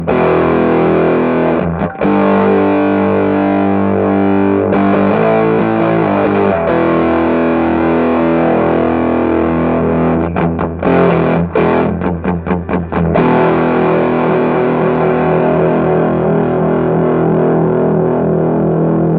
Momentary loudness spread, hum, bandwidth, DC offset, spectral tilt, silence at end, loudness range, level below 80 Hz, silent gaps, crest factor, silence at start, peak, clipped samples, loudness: 3 LU; none; 4.6 kHz; under 0.1%; -12 dB/octave; 0 s; 1 LU; -36 dBFS; none; 12 dB; 0 s; 0 dBFS; under 0.1%; -12 LUFS